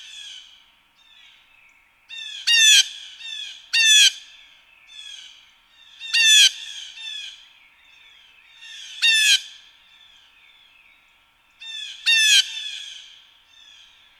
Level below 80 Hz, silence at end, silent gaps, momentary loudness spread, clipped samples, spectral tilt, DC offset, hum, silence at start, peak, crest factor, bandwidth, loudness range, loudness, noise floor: -74 dBFS; 1.25 s; none; 27 LU; under 0.1%; 8 dB/octave; under 0.1%; none; 0.15 s; -2 dBFS; 22 dB; 16 kHz; 6 LU; -15 LUFS; -59 dBFS